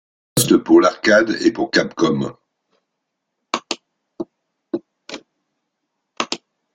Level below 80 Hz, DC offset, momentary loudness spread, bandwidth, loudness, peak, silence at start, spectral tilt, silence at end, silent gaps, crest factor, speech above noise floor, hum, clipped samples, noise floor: -58 dBFS; under 0.1%; 20 LU; 13.5 kHz; -18 LUFS; -2 dBFS; 0.35 s; -4 dB/octave; 0.4 s; none; 20 dB; 62 dB; none; under 0.1%; -77 dBFS